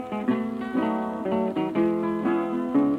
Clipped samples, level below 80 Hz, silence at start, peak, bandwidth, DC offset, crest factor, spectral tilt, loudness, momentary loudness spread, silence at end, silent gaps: under 0.1%; -60 dBFS; 0 s; -12 dBFS; 9.2 kHz; under 0.1%; 14 dB; -8.5 dB/octave; -26 LUFS; 3 LU; 0 s; none